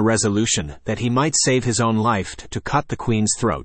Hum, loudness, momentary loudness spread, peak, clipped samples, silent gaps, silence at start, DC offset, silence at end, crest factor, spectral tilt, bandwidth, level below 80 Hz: none; -20 LUFS; 7 LU; -6 dBFS; under 0.1%; none; 0 s; under 0.1%; 0 s; 14 dB; -4 dB/octave; 8.8 kHz; -44 dBFS